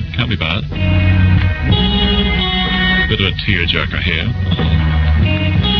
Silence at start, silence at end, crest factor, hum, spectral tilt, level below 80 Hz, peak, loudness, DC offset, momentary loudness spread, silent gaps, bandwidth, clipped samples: 0 s; 0 s; 14 dB; none; -7.5 dB/octave; -20 dBFS; 0 dBFS; -14 LUFS; under 0.1%; 4 LU; none; 6 kHz; under 0.1%